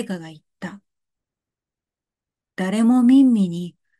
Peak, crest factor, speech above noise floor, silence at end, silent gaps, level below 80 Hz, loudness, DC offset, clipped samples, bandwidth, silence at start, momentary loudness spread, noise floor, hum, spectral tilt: -6 dBFS; 16 dB; 72 dB; 0.3 s; none; -74 dBFS; -17 LUFS; under 0.1%; under 0.1%; 11.5 kHz; 0 s; 22 LU; -89 dBFS; none; -7 dB/octave